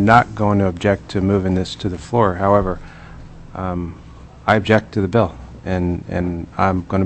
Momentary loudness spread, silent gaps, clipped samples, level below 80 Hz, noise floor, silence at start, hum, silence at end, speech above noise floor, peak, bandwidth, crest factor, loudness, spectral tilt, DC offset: 16 LU; none; under 0.1%; -38 dBFS; -36 dBFS; 0 s; none; 0 s; 19 dB; 0 dBFS; 8.6 kHz; 18 dB; -19 LUFS; -7.5 dB/octave; under 0.1%